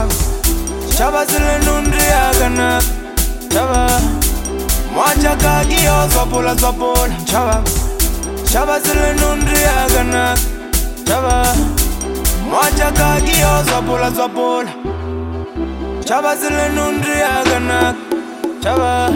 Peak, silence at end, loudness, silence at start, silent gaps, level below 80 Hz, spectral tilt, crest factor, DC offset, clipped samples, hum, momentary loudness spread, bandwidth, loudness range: 0 dBFS; 0 s; -15 LUFS; 0 s; none; -20 dBFS; -4 dB/octave; 14 dB; under 0.1%; under 0.1%; none; 8 LU; 17 kHz; 3 LU